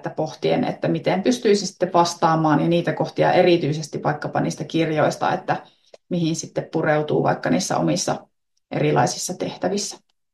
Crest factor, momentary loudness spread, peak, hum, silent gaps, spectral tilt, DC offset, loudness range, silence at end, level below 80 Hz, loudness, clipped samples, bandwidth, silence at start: 18 dB; 9 LU; -4 dBFS; none; none; -5 dB/octave; under 0.1%; 4 LU; 0.35 s; -62 dBFS; -21 LUFS; under 0.1%; 12.5 kHz; 0.05 s